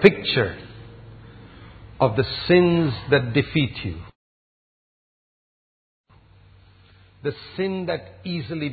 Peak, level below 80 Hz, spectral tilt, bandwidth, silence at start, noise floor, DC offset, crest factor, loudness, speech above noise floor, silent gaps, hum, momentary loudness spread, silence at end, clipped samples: 0 dBFS; -48 dBFS; -8.5 dB/octave; 8 kHz; 0 s; -52 dBFS; under 0.1%; 24 dB; -22 LUFS; 31 dB; 4.15-6.04 s; none; 23 LU; 0 s; under 0.1%